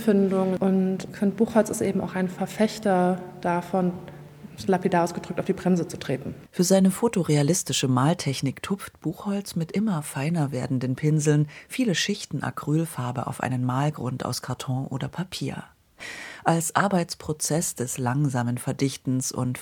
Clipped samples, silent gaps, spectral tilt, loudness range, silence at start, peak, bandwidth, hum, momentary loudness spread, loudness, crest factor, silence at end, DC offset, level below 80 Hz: under 0.1%; none; -5.5 dB/octave; 5 LU; 0 s; -4 dBFS; 19 kHz; none; 9 LU; -25 LUFS; 22 dB; 0 s; under 0.1%; -62 dBFS